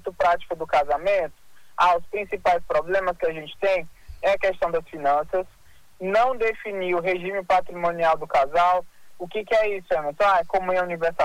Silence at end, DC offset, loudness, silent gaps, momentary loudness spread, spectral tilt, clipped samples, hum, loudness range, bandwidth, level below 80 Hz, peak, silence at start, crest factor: 0 s; under 0.1%; -23 LUFS; none; 8 LU; -5 dB/octave; under 0.1%; none; 2 LU; 15.5 kHz; -50 dBFS; -10 dBFS; 0.05 s; 14 dB